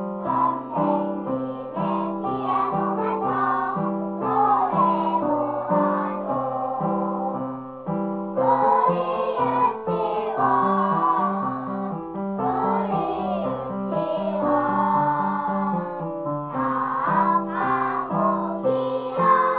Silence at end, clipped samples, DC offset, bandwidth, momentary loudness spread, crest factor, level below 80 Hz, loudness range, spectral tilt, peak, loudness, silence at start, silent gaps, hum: 0 s; under 0.1%; under 0.1%; 4 kHz; 8 LU; 16 dB; -60 dBFS; 3 LU; -11 dB/octave; -8 dBFS; -23 LUFS; 0 s; none; none